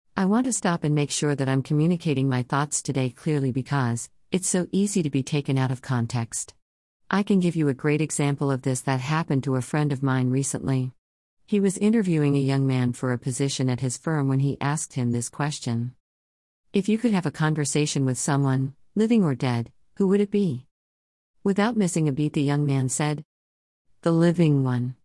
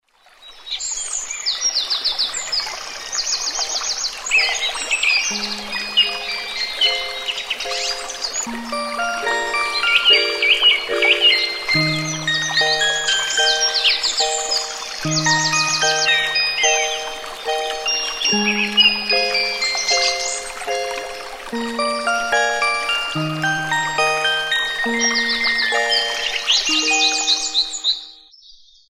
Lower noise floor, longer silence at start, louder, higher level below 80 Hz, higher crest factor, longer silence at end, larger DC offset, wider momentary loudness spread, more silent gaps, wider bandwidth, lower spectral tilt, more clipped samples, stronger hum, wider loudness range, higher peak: first, under -90 dBFS vs -47 dBFS; second, 0.15 s vs 0.4 s; second, -24 LUFS vs -17 LUFS; second, -62 dBFS vs -52 dBFS; about the same, 18 dB vs 18 dB; second, 0.1 s vs 0.4 s; neither; second, 6 LU vs 10 LU; first, 6.62-7.00 s, 10.98-11.37 s, 16.00-16.64 s, 20.71-21.34 s, 23.25-23.85 s vs none; second, 12 kHz vs 16.5 kHz; first, -6 dB/octave vs -1 dB/octave; neither; neither; second, 2 LU vs 5 LU; second, -6 dBFS vs -2 dBFS